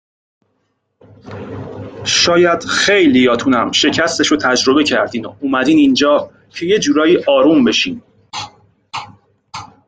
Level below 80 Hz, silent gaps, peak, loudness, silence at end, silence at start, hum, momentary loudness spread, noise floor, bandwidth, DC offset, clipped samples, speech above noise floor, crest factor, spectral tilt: -52 dBFS; none; 0 dBFS; -13 LUFS; 0.2 s; 1.25 s; none; 19 LU; -66 dBFS; 9.4 kHz; under 0.1%; under 0.1%; 53 dB; 14 dB; -3.5 dB/octave